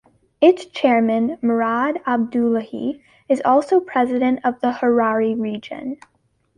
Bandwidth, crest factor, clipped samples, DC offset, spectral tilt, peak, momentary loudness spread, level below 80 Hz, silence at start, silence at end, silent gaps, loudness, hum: 9.8 kHz; 16 dB; under 0.1%; under 0.1%; -6.5 dB/octave; -2 dBFS; 12 LU; -62 dBFS; 0.4 s; 0.6 s; none; -19 LUFS; none